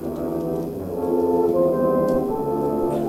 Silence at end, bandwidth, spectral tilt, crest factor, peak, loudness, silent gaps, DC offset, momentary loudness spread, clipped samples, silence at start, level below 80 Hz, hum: 0 s; 16 kHz; -8.5 dB/octave; 14 dB; -8 dBFS; -22 LUFS; none; under 0.1%; 7 LU; under 0.1%; 0 s; -46 dBFS; none